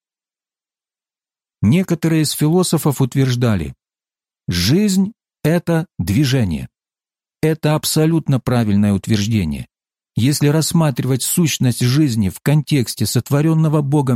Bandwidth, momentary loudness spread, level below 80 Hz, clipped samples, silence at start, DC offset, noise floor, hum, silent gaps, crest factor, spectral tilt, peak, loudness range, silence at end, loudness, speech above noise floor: 16.5 kHz; 7 LU; -44 dBFS; under 0.1%; 1.6 s; under 0.1%; under -90 dBFS; none; none; 14 dB; -5.5 dB/octave; -4 dBFS; 2 LU; 0 s; -17 LUFS; over 74 dB